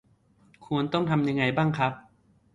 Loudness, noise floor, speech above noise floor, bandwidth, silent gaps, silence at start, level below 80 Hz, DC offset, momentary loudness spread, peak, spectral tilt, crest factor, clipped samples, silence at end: -26 LUFS; -62 dBFS; 36 dB; 7.8 kHz; none; 0.6 s; -60 dBFS; under 0.1%; 6 LU; -10 dBFS; -7.5 dB/octave; 18 dB; under 0.1%; 0.55 s